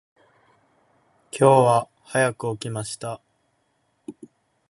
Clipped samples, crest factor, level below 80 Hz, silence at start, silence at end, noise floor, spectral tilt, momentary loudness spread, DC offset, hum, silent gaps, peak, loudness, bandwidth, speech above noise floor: under 0.1%; 22 dB; -66 dBFS; 1.35 s; 0.6 s; -69 dBFS; -5.5 dB/octave; 26 LU; under 0.1%; none; none; -2 dBFS; -22 LUFS; 11.5 kHz; 49 dB